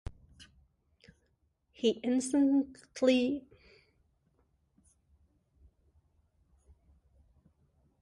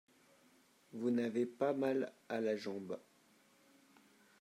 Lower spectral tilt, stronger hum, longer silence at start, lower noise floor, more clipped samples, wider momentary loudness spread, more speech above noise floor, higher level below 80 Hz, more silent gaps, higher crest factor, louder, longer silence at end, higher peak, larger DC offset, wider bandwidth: second, -4.5 dB/octave vs -6.5 dB/octave; neither; second, 0.05 s vs 0.95 s; first, -75 dBFS vs -70 dBFS; neither; about the same, 13 LU vs 12 LU; first, 46 dB vs 32 dB; first, -60 dBFS vs under -90 dBFS; neither; about the same, 22 dB vs 18 dB; first, -30 LUFS vs -39 LUFS; first, 4.6 s vs 1.4 s; first, -14 dBFS vs -22 dBFS; neither; second, 11.5 kHz vs 14 kHz